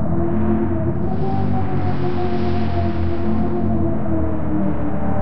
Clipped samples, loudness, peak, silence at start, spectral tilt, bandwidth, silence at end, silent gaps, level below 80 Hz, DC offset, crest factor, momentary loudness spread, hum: under 0.1%; -21 LUFS; -6 dBFS; 0 s; -8.5 dB/octave; 5.8 kHz; 0 s; none; -32 dBFS; 10%; 12 dB; 3 LU; none